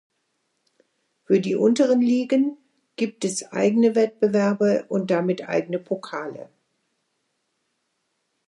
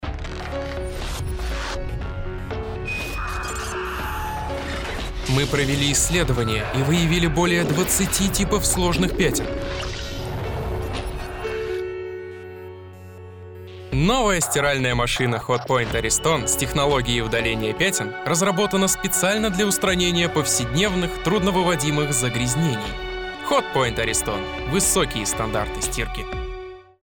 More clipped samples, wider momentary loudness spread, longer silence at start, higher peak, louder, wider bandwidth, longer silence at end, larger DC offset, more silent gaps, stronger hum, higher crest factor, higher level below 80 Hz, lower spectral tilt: neither; about the same, 11 LU vs 12 LU; first, 1.3 s vs 0 s; about the same, -6 dBFS vs -8 dBFS; about the same, -22 LUFS vs -22 LUFS; second, 11.5 kHz vs 19 kHz; first, 2.05 s vs 0.3 s; neither; neither; neither; about the same, 16 dB vs 14 dB; second, -76 dBFS vs -34 dBFS; first, -6 dB/octave vs -3.5 dB/octave